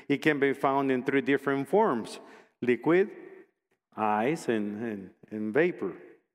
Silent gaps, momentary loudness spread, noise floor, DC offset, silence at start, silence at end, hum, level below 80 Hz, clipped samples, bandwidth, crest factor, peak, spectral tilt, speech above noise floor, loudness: none; 16 LU; -71 dBFS; under 0.1%; 0.1 s; 0.25 s; none; -78 dBFS; under 0.1%; 14.5 kHz; 18 dB; -10 dBFS; -6.5 dB/octave; 43 dB; -28 LUFS